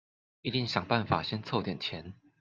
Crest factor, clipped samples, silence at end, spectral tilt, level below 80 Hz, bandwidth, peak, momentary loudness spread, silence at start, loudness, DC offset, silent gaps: 24 dB; under 0.1%; 0.25 s; -6 dB/octave; -64 dBFS; 7.6 kHz; -10 dBFS; 11 LU; 0.45 s; -32 LUFS; under 0.1%; none